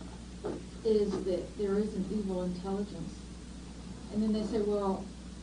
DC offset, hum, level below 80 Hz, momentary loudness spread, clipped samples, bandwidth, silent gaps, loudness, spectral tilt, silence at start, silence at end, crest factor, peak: under 0.1%; none; -50 dBFS; 16 LU; under 0.1%; 10 kHz; none; -34 LUFS; -7 dB/octave; 0 s; 0 s; 16 dB; -18 dBFS